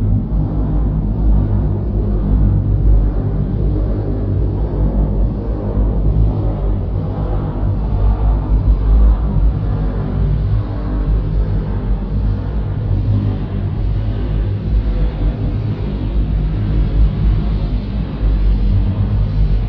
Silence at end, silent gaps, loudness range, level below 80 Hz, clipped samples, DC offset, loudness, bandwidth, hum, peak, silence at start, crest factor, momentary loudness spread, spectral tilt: 0 s; none; 2 LU; -16 dBFS; under 0.1%; under 0.1%; -18 LUFS; 4.6 kHz; none; -2 dBFS; 0 s; 12 dB; 5 LU; -11.5 dB/octave